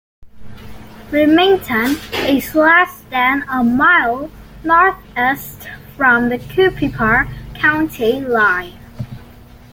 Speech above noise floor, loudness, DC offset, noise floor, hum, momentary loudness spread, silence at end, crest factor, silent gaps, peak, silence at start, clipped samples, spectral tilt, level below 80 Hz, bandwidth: 25 dB; -14 LUFS; under 0.1%; -40 dBFS; none; 19 LU; 0.5 s; 14 dB; none; -2 dBFS; 0.2 s; under 0.1%; -5 dB/octave; -40 dBFS; 17 kHz